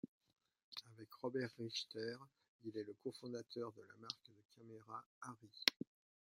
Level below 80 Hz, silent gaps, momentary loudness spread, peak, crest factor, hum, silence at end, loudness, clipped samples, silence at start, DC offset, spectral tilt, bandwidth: under -90 dBFS; 0.08-0.20 s, 0.63-0.72 s, 2.48-2.59 s, 4.45-4.49 s, 5.06-5.21 s; 21 LU; -12 dBFS; 36 dB; none; 0.6 s; -47 LUFS; under 0.1%; 0.05 s; under 0.1%; -3.5 dB/octave; 16 kHz